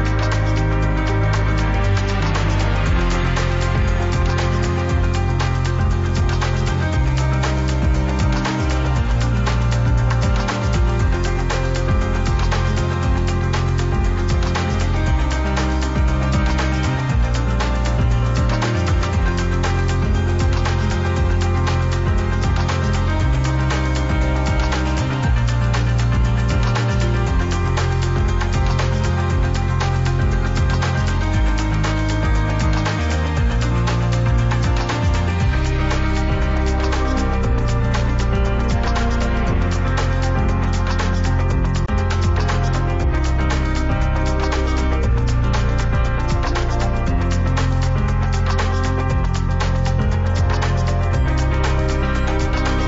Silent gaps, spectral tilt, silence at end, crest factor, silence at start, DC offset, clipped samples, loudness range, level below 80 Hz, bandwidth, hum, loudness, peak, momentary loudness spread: none; -6 dB/octave; 0 s; 10 dB; 0 s; under 0.1%; under 0.1%; 1 LU; -20 dBFS; 8 kHz; none; -19 LUFS; -8 dBFS; 1 LU